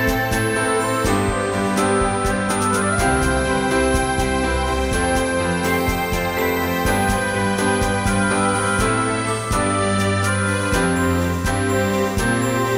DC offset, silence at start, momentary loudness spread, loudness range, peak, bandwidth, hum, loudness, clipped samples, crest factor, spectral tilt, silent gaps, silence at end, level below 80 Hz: under 0.1%; 0 s; 2 LU; 1 LU; -6 dBFS; 16 kHz; none; -19 LUFS; under 0.1%; 14 dB; -4.5 dB/octave; none; 0 s; -30 dBFS